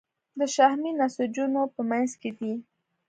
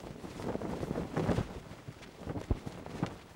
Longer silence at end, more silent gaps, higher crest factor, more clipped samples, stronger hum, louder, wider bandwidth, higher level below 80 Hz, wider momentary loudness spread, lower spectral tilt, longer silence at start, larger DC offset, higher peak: first, 0.45 s vs 0 s; neither; about the same, 20 dB vs 22 dB; neither; neither; first, -27 LUFS vs -38 LUFS; second, 9.4 kHz vs 17 kHz; second, -80 dBFS vs -48 dBFS; about the same, 12 LU vs 13 LU; second, -4 dB/octave vs -7 dB/octave; first, 0.35 s vs 0 s; neither; first, -6 dBFS vs -16 dBFS